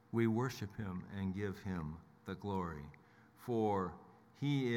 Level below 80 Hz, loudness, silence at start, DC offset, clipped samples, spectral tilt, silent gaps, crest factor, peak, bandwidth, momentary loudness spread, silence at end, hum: -68 dBFS; -40 LUFS; 0.1 s; under 0.1%; under 0.1%; -7.5 dB/octave; none; 18 dB; -22 dBFS; 17.5 kHz; 16 LU; 0 s; none